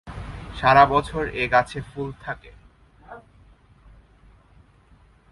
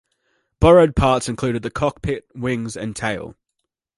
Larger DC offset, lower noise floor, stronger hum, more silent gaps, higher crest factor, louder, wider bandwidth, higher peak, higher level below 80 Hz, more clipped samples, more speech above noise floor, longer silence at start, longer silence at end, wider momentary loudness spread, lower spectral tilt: neither; second, -55 dBFS vs -78 dBFS; neither; neither; first, 24 dB vs 18 dB; about the same, -21 LUFS vs -19 LUFS; about the same, 11.5 kHz vs 11.5 kHz; about the same, -2 dBFS vs -2 dBFS; second, -44 dBFS vs -34 dBFS; neither; second, 34 dB vs 60 dB; second, 0.05 s vs 0.6 s; first, 2.15 s vs 0.65 s; first, 21 LU vs 14 LU; about the same, -6 dB/octave vs -6 dB/octave